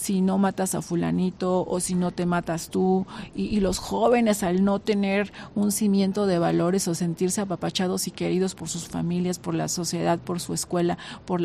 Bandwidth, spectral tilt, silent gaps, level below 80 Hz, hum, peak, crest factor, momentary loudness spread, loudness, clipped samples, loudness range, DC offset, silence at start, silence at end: 15 kHz; -5.5 dB/octave; none; -50 dBFS; none; -8 dBFS; 16 dB; 6 LU; -25 LUFS; under 0.1%; 4 LU; under 0.1%; 0 s; 0 s